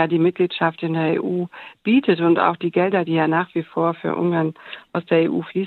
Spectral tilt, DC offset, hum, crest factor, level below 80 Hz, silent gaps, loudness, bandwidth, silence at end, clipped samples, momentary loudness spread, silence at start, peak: -9 dB/octave; under 0.1%; none; 18 dB; -72 dBFS; none; -20 LUFS; 4.4 kHz; 0 s; under 0.1%; 9 LU; 0 s; -2 dBFS